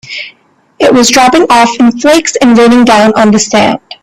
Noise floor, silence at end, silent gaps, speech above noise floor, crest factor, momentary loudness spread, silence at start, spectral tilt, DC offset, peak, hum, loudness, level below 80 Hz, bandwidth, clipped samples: -47 dBFS; 0.1 s; none; 42 dB; 6 dB; 7 LU; 0.05 s; -3.5 dB/octave; under 0.1%; 0 dBFS; none; -6 LUFS; -42 dBFS; 14.5 kHz; 0.4%